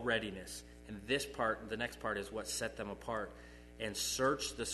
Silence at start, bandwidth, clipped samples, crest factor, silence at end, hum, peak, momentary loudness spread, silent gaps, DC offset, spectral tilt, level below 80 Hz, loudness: 0 s; 12.5 kHz; under 0.1%; 20 dB; 0 s; 60 Hz at -55 dBFS; -20 dBFS; 15 LU; none; under 0.1%; -2.5 dB/octave; -58 dBFS; -39 LUFS